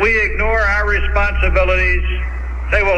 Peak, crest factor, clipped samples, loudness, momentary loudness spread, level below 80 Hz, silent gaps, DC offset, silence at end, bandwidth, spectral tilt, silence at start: -2 dBFS; 12 dB; under 0.1%; -16 LUFS; 8 LU; -18 dBFS; none; under 0.1%; 0 s; 7 kHz; -6 dB/octave; 0 s